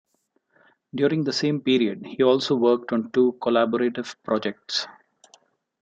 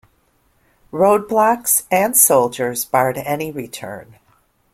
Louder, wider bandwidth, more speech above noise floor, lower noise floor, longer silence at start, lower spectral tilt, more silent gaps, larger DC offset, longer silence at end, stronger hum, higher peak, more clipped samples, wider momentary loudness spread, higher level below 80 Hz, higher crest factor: second, -23 LUFS vs -15 LUFS; second, 7.8 kHz vs 16.5 kHz; first, 48 dB vs 43 dB; first, -70 dBFS vs -60 dBFS; about the same, 0.95 s vs 0.95 s; first, -5.5 dB/octave vs -3.5 dB/octave; neither; neither; first, 0.9 s vs 0.7 s; neither; second, -6 dBFS vs 0 dBFS; neither; second, 7 LU vs 19 LU; second, -70 dBFS vs -58 dBFS; about the same, 18 dB vs 18 dB